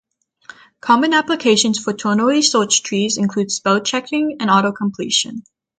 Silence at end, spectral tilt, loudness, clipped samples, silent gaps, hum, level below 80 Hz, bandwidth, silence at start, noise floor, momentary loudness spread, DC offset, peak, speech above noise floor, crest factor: 0.4 s; -3 dB/octave; -16 LUFS; under 0.1%; none; none; -62 dBFS; 9.4 kHz; 0.85 s; -43 dBFS; 7 LU; under 0.1%; 0 dBFS; 27 dB; 16 dB